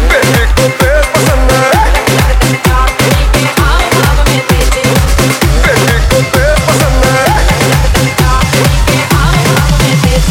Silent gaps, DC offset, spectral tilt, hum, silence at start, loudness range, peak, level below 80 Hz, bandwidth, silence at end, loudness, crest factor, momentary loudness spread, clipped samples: none; under 0.1%; -4.5 dB/octave; none; 0 s; 0 LU; 0 dBFS; -12 dBFS; 17 kHz; 0 s; -8 LUFS; 8 dB; 2 LU; 0.3%